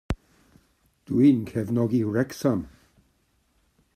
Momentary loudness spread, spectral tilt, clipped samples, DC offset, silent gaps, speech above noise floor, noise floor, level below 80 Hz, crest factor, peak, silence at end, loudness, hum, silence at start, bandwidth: 15 LU; -8 dB/octave; under 0.1%; under 0.1%; none; 45 dB; -68 dBFS; -48 dBFS; 18 dB; -8 dBFS; 1.3 s; -24 LUFS; none; 0.1 s; 14.5 kHz